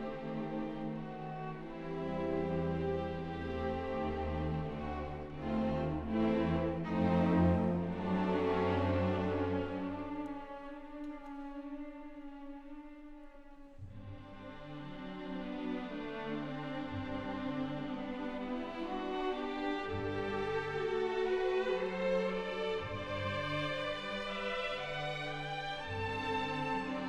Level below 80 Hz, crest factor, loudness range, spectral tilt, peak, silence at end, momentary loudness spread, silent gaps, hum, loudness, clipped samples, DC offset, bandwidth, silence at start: -52 dBFS; 18 dB; 14 LU; -7.5 dB/octave; -20 dBFS; 0 s; 15 LU; none; none; -37 LUFS; under 0.1%; under 0.1%; 9.6 kHz; 0 s